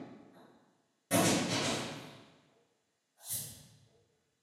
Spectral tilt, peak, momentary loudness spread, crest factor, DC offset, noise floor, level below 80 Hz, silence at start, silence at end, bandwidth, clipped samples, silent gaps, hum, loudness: -3.5 dB/octave; -16 dBFS; 24 LU; 22 dB; under 0.1%; -79 dBFS; -70 dBFS; 0 s; 0.8 s; 16 kHz; under 0.1%; none; none; -33 LUFS